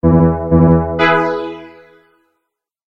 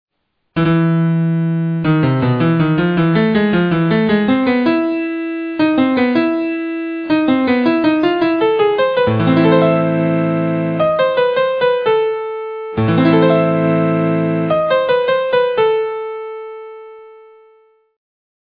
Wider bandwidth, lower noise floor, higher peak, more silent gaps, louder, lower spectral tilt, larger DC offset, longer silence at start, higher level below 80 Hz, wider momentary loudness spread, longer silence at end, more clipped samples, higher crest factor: first, 5.8 kHz vs 5 kHz; first, -74 dBFS vs -69 dBFS; about the same, 0 dBFS vs 0 dBFS; neither; about the same, -13 LUFS vs -15 LUFS; second, -9 dB/octave vs -10.5 dB/octave; neither; second, 0.05 s vs 0.55 s; first, -32 dBFS vs -48 dBFS; first, 14 LU vs 9 LU; about the same, 1.25 s vs 1.3 s; neither; about the same, 14 dB vs 14 dB